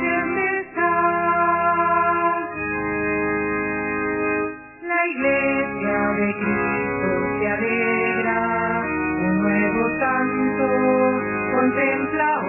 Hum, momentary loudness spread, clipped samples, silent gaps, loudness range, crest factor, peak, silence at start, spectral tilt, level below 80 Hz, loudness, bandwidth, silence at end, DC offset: none; 5 LU; under 0.1%; none; 2 LU; 14 dB; -8 dBFS; 0 s; -10 dB/octave; -48 dBFS; -21 LUFS; 3 kHz; 0 s; under 0.1%